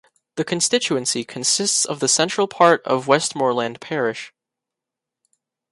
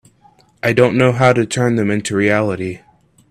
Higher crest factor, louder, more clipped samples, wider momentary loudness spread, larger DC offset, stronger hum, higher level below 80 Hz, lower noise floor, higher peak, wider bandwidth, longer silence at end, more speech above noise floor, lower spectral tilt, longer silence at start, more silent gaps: about the same, 20 dB vs 16 dB; second, -19 LUFS vs -15 LUFS; neither; about the same, 9 LU vs 11 LU; neither; neither; second, -68 dBFS vs -50 dBFS; first, -86 dBFS vs -51 dBFS; about the same, 0 dBFS vs 0 dBFS; second, 11.5 kHz vs 14.5 kHz; first, 1.45 s vs 0.55 s; first, 66 dB vs 37 dB; second, -2.5 dB/octave vs -6 dB/octave; second, 0.35 s vs 0.65 s; neither